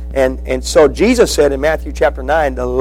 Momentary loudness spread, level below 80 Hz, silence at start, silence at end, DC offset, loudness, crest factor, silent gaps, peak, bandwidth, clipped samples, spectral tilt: 6 LU; -24 dBFS; 0 s; 0 s; under 0.1%; -13 LUFS; 12 dB; none; 0 dBFS; 16.5 kHz; under 0.1%; -4.5 dB/octave